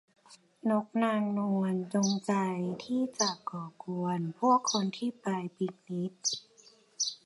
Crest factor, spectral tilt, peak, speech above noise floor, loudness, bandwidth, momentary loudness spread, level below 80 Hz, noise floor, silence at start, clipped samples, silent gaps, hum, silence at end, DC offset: 18 dB; -4.5 dB/octave; -14 dBFS; 30 dB; -32 LUFS; 11.5 kHz; 10 LU; -80 dBFS; -61 dBFS; 0.3 s; under 0.1%; none; none; 0.1 s; under 0.1%